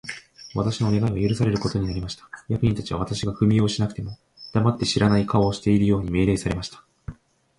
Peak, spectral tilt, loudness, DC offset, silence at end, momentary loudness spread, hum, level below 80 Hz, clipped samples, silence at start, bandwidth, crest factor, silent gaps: -4 dBFS; -6.5 dB/octave; -23 LUFS; under 0.1%; 0.45 s; 17 LU; none; -42 dBFS; under 0.1%; 0.05 s; 11.5 kHz; 18 dB; none